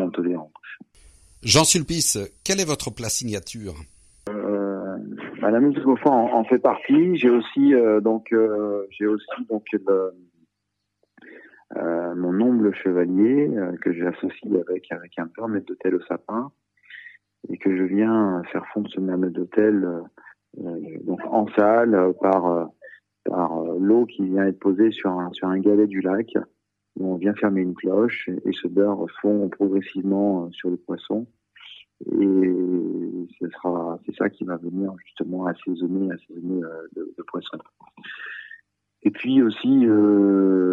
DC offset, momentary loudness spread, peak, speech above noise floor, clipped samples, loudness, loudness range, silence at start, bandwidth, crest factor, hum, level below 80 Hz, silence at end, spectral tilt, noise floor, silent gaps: under 0.1%; 16 LU; -2 dBFS; 57 dB; under 0.1%; -22 LUFS; 8 LU; 0 s; 13 kHz; 20 dB; none; -58 dBFS; 0 s; -5 dB/octave; -78 dBFS; none